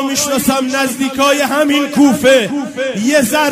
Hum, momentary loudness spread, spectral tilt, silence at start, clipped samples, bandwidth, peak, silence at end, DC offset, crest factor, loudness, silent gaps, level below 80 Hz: none; 6 LU; -3 dB/octave; 0 s; under 0.1%; 16 kHz; 0 dBFS; 0 s; under 0.1%; 12 dB; -13 LUFS; none; -50 dBFS